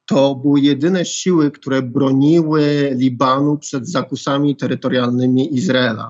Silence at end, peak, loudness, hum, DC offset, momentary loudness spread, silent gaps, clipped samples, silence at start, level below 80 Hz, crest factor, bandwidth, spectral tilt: 0 s; -2 dBFS; -16 LUFS; none; under 0.1%; 7 LU; none; under 0.1%; 0.1 s; -70 dBFS; 14 dB; 8 kHz; -6 dB/octave